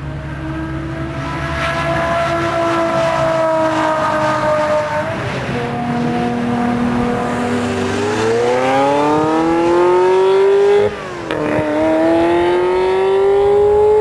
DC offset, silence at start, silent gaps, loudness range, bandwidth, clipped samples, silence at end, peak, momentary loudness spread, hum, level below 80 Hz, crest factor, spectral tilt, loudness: under 0.1%; 0 s; none; 4 LU; 11 kHz; under 0.1%; 0 s; 0 dBFS; 9 LU; none; -38 dBFS; 14 dB; -6 dB/octave; -15 LUFS